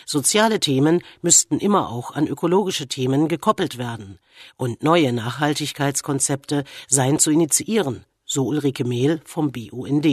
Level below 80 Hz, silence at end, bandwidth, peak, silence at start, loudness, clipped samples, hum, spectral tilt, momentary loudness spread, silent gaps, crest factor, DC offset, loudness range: -60 dBFS; 0 s; 13.5 kHz; -2 dBFS; 0.05 s; -20 LUFS; under 0.1%; none; -4 dB/octave; 10 LU; none; 20 dB; under 0.1%; 4 LU